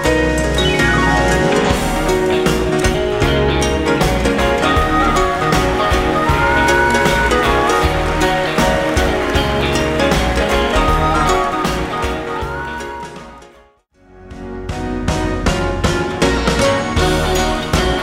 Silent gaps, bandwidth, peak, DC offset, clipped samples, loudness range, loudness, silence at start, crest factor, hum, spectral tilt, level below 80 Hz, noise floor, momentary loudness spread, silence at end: none; 16 kHz; 0 dBFS; under 0.1%; under 0.1%; 8 LU; -15 LUFS; 0 s; 14 dB; none; -5 dB/octave; -24 dBFS; -50 dBFS; 8 LU; 0 s